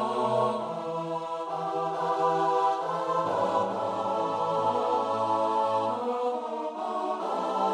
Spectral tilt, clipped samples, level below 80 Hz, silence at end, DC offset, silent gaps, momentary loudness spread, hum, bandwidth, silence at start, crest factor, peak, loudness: -5.5 dB/octave; under 0.1%; -76 dBFS; 0 s; under 0.1%; none; 7 LU; none; 12 kHz; 0 s; 16 dB; -12 dBFS; -28 LUFS